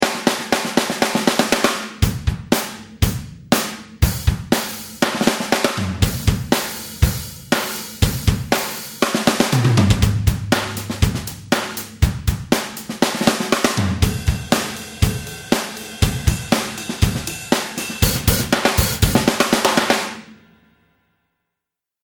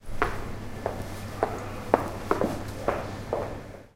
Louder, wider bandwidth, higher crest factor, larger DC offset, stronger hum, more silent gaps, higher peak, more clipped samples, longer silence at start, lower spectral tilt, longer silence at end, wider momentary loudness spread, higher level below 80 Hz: first, -19 LUFS vs -31 LUFS; first, over 20 kHz vs 16.5 kHz; second, 20 dB vs 30 dB; neither; neither; neither; about the same, 0 dBFS vs 0 dBFS; neither; about the same, 0 s vs 0 s; second, -4.5 dB/octave vs -6 dB/octave; first, 1.7 s vs 0.05 s; about the same, 8 LU vs 10 LU; first, -28 dBFS vs -42 dBFS